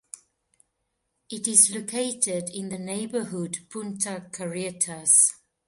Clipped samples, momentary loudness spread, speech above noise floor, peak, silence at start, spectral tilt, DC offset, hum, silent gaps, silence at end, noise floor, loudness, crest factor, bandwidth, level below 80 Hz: under 0.1%; 17 LU; 52 dB; -4 dBFS; 1.3 s; -2.5 dB/octave; under 0.1%; none; none; 0.3 s; -78 dBFS; -23 LUFS; 24 dB; 12 kHz; -72 dBFS